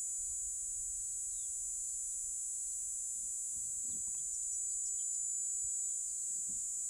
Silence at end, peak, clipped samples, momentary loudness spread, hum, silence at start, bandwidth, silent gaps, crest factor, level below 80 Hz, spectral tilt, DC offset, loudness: 0 s; -28 dBFS; under 0.1%; 3 LU; none; 0 s; over 20 kHz; none; 12 dB; -66 dBFS; 1 dB/octave; under 0.1%; -36 LUFS